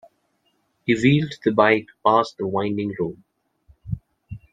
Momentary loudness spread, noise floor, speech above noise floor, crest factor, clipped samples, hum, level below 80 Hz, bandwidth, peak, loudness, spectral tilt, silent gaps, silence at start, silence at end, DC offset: 16 LU; -68 dBFS; 48 dB; 22 dB; under 0.1%; none; -50 dBFS; 9.2 kHz; -2 dBFS; -21 LUFS; -7 dB/octave; none; 0.85 s; 0.15 s; under 0.1%